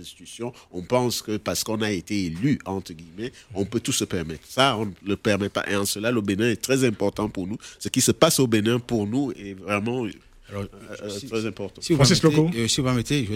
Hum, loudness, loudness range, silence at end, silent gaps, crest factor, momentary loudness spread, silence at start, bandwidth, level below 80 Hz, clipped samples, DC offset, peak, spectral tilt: none; -24 LUFS; 4 LU; 0 s; none; 24 dB; 16 LU; 0 s; 16.5 kHz; -50 dBFS; under 0.1%; under 0.1%; 0 dBFS; -4.5 dB/octave